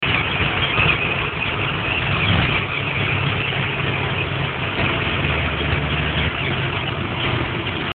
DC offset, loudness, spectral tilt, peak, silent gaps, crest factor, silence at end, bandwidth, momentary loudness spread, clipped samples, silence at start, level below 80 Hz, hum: under 0.1%; -20 LUFS; -8.5 dB/octave; -4 dBFS; none; 16 dB; 0 s; 4.6 kHz; 5 LU; under 0.1%; 0 s; -34 dBFS; none